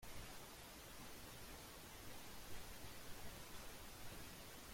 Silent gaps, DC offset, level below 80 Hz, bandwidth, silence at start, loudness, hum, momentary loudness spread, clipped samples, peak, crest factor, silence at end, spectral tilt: none; under 0.1%; -62 dBFS; 16.5 kHz; 0 s; -56 LUFS; none; 1 LU; under 0.1%; -38 dBFS; 14 dB; 0 s; -3 dB/octave